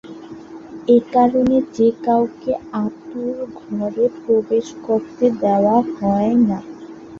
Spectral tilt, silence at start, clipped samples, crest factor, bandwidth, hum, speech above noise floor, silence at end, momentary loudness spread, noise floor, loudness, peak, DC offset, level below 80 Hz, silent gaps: -8 dB/octave; 0.05 s; under 0.1%; 16 dB; 7.2 kHz; none; 18 dB; 0 s; 16 LU; -36 dBFS; -18 LUFS; -2 dBFS; under 0.1%; -52 dBFS; none